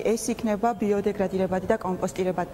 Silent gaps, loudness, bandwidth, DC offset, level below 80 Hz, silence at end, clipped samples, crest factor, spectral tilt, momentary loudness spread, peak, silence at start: none; -26 LUFS; 16 kHz; under 0.1%; -50 dBFS; 0 s; under 0.1%; 18 dB; -6 dB/octave; 2 LU; -8 dBFS; 0 s